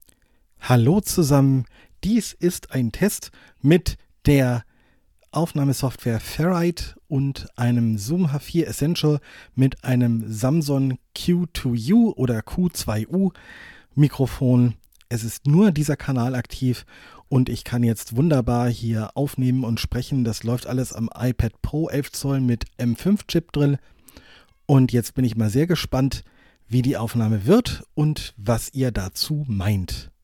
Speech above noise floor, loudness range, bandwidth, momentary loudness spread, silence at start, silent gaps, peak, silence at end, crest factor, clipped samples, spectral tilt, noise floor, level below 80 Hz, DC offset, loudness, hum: 38 dB; 3 LU; 17.5 kHz; 9 LU; 0.6 s; none; -4 dBFS; 0.15 s; 18 dB; under 0.1%; -6.5 dB/octave; -59 dBFS; -40 dBFS; under 0.1%; -22 LUFS; none